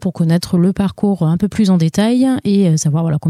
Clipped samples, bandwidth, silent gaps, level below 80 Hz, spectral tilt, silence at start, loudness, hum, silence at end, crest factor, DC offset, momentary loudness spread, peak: under 0.1%; 14 kHz; none; -44 dBFS; -7 dB/octave; 0 s; -14 LUFS; none; 0 s; 10 dB; under 0.1%; 3 LU; -4 dBFS